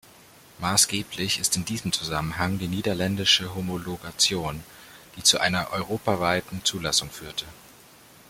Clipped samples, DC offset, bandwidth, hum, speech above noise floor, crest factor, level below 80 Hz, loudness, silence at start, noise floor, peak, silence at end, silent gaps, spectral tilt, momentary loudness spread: under 0.1%; under 0.1%; 16.5 kHz; none; 26 dB; 24 dB; -54 dBFS; -24 LUFS; 0.6 s; -52 dBFS; -4 dBFS; 0.65 s; none; -2.5 dB/octave; 14 LU